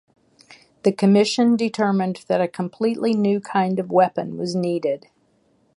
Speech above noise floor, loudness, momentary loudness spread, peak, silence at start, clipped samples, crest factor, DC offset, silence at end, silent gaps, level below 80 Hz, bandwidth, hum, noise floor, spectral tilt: 43 dB; -21 LUFS; 8 LU; -4 dBFS; 0.85 s; under 0.1%; 18 dB; under 0.1%; 0.8 s; none; -70 dBFS; 11.5 kHz; none; -62 dBFS; -6.5 dB/octave